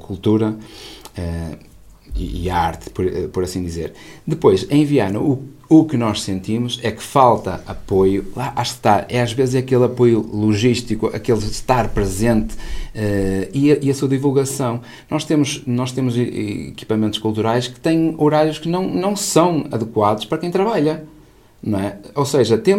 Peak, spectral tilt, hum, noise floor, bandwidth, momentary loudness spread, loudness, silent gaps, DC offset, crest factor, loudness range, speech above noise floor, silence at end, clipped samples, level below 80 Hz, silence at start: 0 dBFS; -6 dB/octave; none; -47 dBFS; 16 kHz; 12 LU; -18 LUFS; none; under 0.1%; 18 dB; 3 LU; 29 dB; 0 s; under 0.1%; -36 dBFS; 0 s